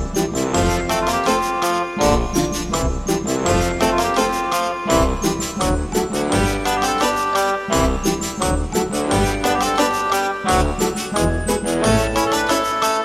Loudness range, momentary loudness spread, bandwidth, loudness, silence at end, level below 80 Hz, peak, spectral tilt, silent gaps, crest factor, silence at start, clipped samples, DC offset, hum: 1 LU; 4 LU; 16.5 kHz; -19 LUFS; 0 s; -28 dBFS; -2 dBFS; -4 dB/octave; none; 16 dB; 0 s; under 0.1%; under 0.1%; none